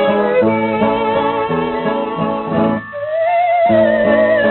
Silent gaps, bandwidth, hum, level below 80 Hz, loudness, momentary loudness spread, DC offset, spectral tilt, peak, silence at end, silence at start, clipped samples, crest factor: none; 4.2 kHz; none; -48 dBFS; -15 LUFS; 7 LU; under 0.1%; -4.5 dB/octave; -2 dBFS; 0 s; 0 s; under 0.1%; 12 dB